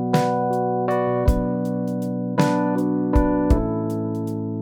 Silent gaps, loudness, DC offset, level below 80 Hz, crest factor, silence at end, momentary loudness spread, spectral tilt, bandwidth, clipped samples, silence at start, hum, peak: none; -22 LUFS; under 0.1%; -28 dBFS; 18 dB; 0 s; 6 LU; -8 dB/octave; 18.5 kHz; under 0.1%; 0 s; none; -4 dBFS